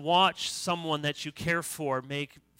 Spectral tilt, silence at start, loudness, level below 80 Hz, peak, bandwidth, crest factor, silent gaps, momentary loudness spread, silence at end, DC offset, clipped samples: -3.5 dB/octave; 0 s; -30 LUFS; -62 dBFS; -10 dBFS; 16 kHz; 20 dB; none; 10 LU; 0.35 s; under 0.1%; under 0.1%